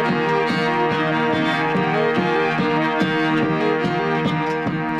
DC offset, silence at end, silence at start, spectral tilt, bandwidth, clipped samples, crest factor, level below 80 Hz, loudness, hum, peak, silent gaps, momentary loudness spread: under 0.1%; 0 s; 0 s; -6.5 dB/octave; 11 kHz; under 0.1%; 14 dB; -56 dBFS; -19 LUFS; none; -6 dBFS; none; 2 LU